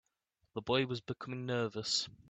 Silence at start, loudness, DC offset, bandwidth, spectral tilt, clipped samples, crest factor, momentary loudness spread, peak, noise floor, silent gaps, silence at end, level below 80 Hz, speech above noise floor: 0.55 s; -36 LUFS; under 0.1%; 9 kHz; -4 dB/octave; under 0.1%; 20 dB; 10 LU; -18 dBFS; -80 dBFS; none; 0.2 s; -70 dBFS; 44 dB